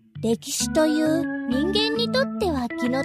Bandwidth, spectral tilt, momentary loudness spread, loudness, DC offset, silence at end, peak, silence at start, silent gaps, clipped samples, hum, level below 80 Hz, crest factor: 15.5 kHz; -4 dB/octave; 5 LU; -23 LUFS; under 0.1%; 0 s; -8 dBFS; 0.15 s; none; under 0.1%; none; -46 dBFS; 16 dB